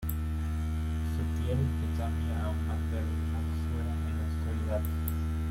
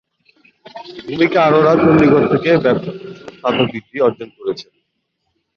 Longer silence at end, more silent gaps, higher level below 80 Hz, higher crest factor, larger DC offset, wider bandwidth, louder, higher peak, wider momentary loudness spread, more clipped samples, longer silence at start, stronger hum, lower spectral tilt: second, 0 s vs 0.95 s; neither; first, -36 dBFS vs -50 dBFS; about the same, 14 dB vs 14 dB; neither; first, 16.5 kHz vs 6.8 kHz; second, -33 LUFS vs -14 LUFS; second, -16 dBFS vs -2 dBFS; second, 2 LU vs 20 LU; neither; second, 0 s vs 0.75 s; neither; about the same, -7.5 dB/octave vs -8 dB/octave